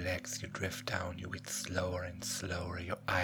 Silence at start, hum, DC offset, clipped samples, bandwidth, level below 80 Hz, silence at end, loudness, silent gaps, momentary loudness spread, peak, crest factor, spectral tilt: 0 s; 50 Hz at -55 dBFS; under 0.1%; under 0.1%; over 20 kHz; -58 dBFS; 0 s; -38 LUFS; none; 4 LU; -18 dBFS; 20 dB; -3.5 dB/octave